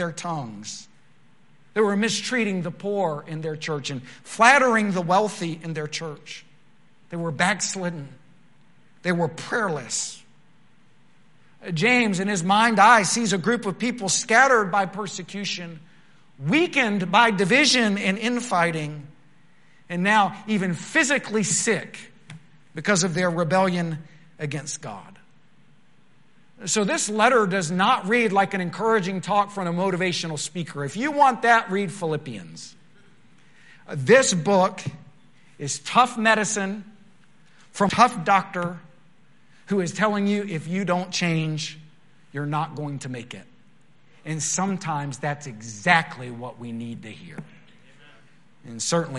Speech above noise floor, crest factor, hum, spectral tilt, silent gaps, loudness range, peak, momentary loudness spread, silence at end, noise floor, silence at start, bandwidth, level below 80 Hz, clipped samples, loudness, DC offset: 37 dB; 24 dB; none; -4 dB/octave; none; 8 LU; 0 dBFS; 19 LU; 0 s; -60 dBFS; 0 s; 11.5 kHz; -70 dBFS; under 0.1%; -22 LUFS; 0.3%